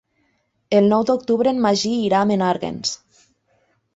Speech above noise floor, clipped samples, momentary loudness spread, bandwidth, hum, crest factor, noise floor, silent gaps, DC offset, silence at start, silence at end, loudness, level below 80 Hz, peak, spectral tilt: 49 dB; under 0.1%; 9 LU; 8 kHz; none; 16 dB; -67 dBFS; none; under 0.1%; 0.7 s; 1 s; -19 LUFS; -60 dBFS; -4 dBFS; -5 dB/octave